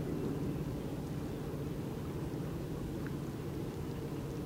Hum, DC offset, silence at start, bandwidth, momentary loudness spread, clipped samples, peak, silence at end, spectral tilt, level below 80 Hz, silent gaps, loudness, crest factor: none; under 0.1%; 0 s; 16 kHz; 3 LU; under 0.1%; -26 dBFS; 0 s; -7.5 dB/octave; -50 dBFS; none; -40 LUFS; 14 dB